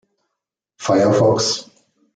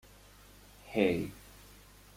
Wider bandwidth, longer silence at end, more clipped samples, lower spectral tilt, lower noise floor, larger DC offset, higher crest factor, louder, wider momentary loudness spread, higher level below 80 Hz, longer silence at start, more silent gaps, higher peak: second, 9.4 kHz vs 16.5 kHz; second, 0.55 s vs 0.75 s; neither; second, -4.5 dB/octave vs -6 dB/octave; first, -81 dBFS vs -57 dBFS; neither; second, 16 dB vs 24 dB; first, -17 LUFS vs -33 LUFS; second, 11 LU vs 26 LU; about the same, -60 dBFS vs -60 dBFS; about the same, 0.8 s vs 0.85 s; neither; first, -4 dBFS vs -14 dBFS